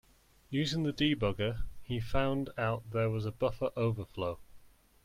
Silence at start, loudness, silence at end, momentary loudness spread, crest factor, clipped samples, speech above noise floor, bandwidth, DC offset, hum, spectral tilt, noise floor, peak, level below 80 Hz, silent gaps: 0.5 s; -34 LUFS; 0.4 s; 8 LU; 18 dB; under 0.1%; 24 dB; 15.5 kHz; under 0.1%; none; -6.5 dB/octave; -57 dBFS; -16 dBFS; -48 dBFS; none